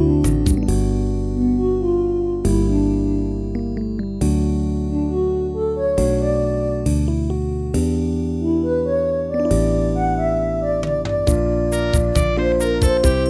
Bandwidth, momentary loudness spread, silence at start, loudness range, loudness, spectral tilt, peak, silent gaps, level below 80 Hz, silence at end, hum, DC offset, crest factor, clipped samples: 11 kHz; 5 LU; 0 s; 2 LU; -20 LUFS; -7.5 dB/octave; -2 dBFS; none; -24 dBFS; 0 s; none; 0.1%; 16 dB; under 0.1%